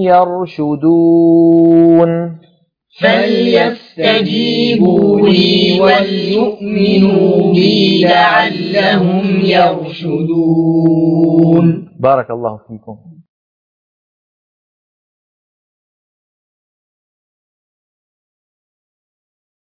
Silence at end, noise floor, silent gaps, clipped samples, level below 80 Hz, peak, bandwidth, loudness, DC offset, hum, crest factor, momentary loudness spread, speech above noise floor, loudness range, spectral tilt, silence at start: 6.5 s; -53 dBFS; none; under 0.1%; -54 dBFS; 0 dBFS; 5.2 kHz; -11 LUFS; under 0.1%; none; 12 dB; 8 LU; 42 dB; 5 LU; -8 dB/octave; 0 s